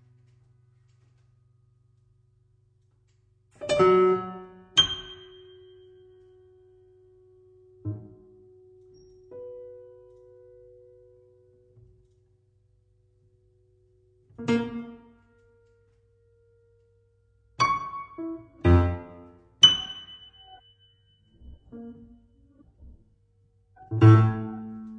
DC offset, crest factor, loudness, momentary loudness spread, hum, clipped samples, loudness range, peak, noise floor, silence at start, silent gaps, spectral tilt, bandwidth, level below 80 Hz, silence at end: under 0.1%; 26 dB; -23 LUFS; 29 LU; none; under 0.1%; 22 LU; -4 dBFS; -65 dBFS; 3.6 s; none; -5.5 dB/octave; 8.8 kHz; -48 dBFS; 0 s